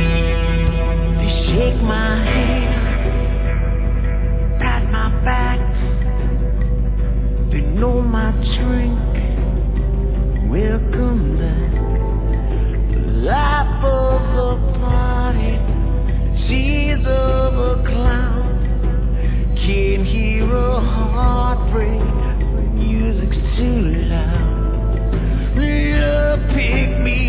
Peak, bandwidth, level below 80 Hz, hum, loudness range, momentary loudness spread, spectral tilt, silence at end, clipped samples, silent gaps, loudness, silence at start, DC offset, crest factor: -2 dBFS; 4 kHz; -16 dBFS; 50 Hz at -15 dBFS; 1 LU; 3 LU; -11 dB/octave; 0 s; under 0.1%; none; -18 LUFS; 0 s; under 0.1%; 12 dB